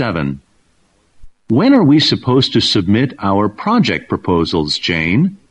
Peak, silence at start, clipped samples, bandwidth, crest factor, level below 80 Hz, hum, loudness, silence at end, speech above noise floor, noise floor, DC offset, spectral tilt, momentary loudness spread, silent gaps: 0 dBFS; 0 s; under 0.1%; 9.4 kHz; 14 dB; -42 dBFS; none; -14 LUFS; 0.15 s; 44 dB; -57 dBFS; under 0.1%; -6 dB/octave; 8 LU; none